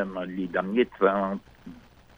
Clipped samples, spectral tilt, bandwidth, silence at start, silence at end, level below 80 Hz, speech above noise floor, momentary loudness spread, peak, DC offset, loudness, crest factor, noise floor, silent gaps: under 0.1%; -8 dB/octave; over 20 kHz; 0 s; 0.4 s; -58 dBFS; 21 dB; 24 LU; -8 dBFS; under 0.1%; -27 LUFS; 20 dB; -47 dBFS; none